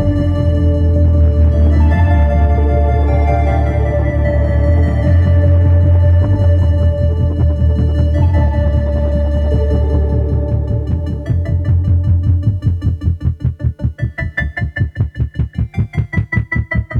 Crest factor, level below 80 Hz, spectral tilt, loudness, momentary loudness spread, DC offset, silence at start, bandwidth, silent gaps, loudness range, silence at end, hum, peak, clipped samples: 10 dB; -16 dBFS; -10 dB/octave; -14 LUFS; 8 LU; under 0.1%; 0 s; 4.3 kHz; none; 6 LU; 0 s; none; -2 dBFS; under 0.1%